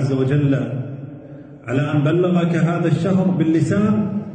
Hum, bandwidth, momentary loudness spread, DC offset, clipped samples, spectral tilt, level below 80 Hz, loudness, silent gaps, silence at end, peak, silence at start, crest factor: none; 9.2 kHz; 17 LU; under 0.1%; under 0.1%; -8.5 dB/octave; -52 dBFS; -18 LUFS; none; 0 s; -6 dBFS; 0 s; 12 dB